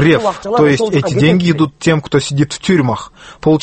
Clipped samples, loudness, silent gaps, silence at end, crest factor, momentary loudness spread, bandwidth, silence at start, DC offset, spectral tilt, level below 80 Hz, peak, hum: under 0.1%; -13 LUFS; none; 0 s; 12 dB; 7 LU; 8.8 kHz; 0 s; under 0.1%; -6 dB/octave; -44 dBFS; 0 dBFS; none